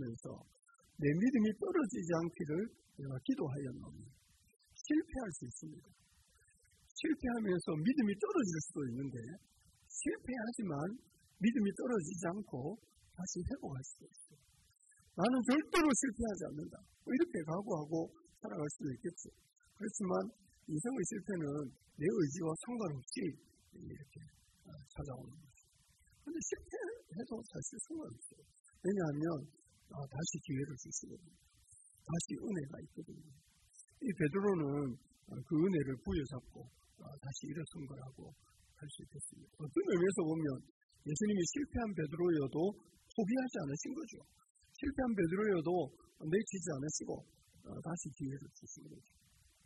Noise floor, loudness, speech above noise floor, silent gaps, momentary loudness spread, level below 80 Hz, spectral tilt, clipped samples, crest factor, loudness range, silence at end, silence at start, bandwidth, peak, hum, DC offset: -71 dBFS; -39 LUFS; 32 dB; 6.91-6.95 s, 28.60-28.64 s, 40.70-40.89 s, 44.50-44.55 s; 20 LU; -64 dBFS; -5.5 dB/octave; under 0.1%; 20 dB; 9 LU; 0.65 s; 0 s; 12 kHz; -20 dBFS; none; under 0.1%